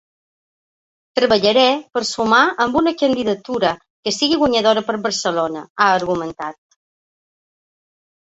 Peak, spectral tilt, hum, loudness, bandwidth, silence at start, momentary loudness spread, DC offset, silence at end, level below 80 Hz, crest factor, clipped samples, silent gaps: -2 dBFS; -3.5 dB/octave; none; -17 LUFS; 8.2 kHz; 1.15 s; 10 LU; under 0.1%; 1.75 s; -54 dBFS; 18 dB; under 0.1%; 3.90-4.03 s, 5.70-5.75 s